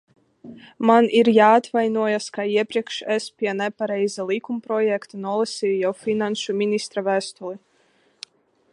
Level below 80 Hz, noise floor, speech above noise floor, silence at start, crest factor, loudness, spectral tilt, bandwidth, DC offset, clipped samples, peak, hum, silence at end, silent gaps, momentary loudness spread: -74 dBFS; -62 dBFS; 41 dB; 0.45 s; 20 dB; -21 LUFS; -4.5 dB/octave; 11 kHz; under 0.1%; under 0.1%; -2 dBFS; none; 1.15 s; none; 14 LU